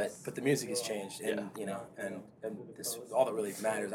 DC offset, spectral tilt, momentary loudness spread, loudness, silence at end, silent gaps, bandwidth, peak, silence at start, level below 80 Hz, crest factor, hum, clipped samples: under 0.1%; -4 dB/octave; 11 LU; -36 LUFS; 0 s; none; 18 kHz; -14 dBFS; 0 s; -78 dBFS; 20 dB; none; under 0.1%